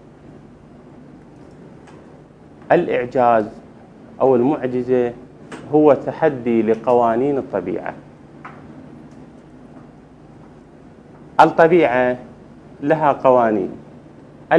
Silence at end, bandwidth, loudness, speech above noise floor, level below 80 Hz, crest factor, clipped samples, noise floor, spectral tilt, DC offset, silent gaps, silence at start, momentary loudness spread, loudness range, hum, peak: 0 s; 10 kHz; -17 LUFS; 27 dB; -56 dBFS; 20 dB; under 0.1%; -43 dBFS; -8 dB/octave; under 0.1%; none; 2.7 s; 24 LU; 8 LU; none; 0 dBFS